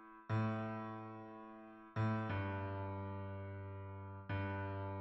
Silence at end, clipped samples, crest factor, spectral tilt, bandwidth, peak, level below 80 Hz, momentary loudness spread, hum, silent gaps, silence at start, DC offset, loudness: 0 s; under 0.1%; 16 dB; -7 dB/octave; 5.8 kHz; -26 dBFS; -72 dBFS; 13 LU; none; none; 0 s; under 0.1%; -44 LUFS